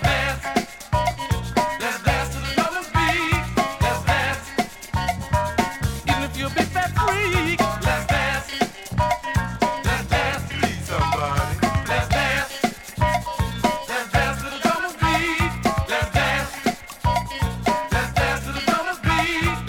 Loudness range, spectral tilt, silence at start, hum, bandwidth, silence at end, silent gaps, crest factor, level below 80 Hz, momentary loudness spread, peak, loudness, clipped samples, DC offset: 1 LU; -4.5 dB/octave; 0 s; none; 17.5 kHz; 0 s; none; 16 dB; -32 dBFS; 5 LU; -6 dBFS; -22 LUFS; under 0.1%; under 0.1%